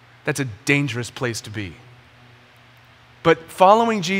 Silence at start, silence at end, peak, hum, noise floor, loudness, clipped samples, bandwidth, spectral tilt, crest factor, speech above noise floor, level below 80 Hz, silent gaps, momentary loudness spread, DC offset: 0.25 s; 0 s; 0 dBFS; none; -50 dBFS; -19 LUFS; under 0.1%; 16 kHz; -5 dB/octave; 22 dB; 30 dB; -58 dBFS; none; 16 LU; under 0.1%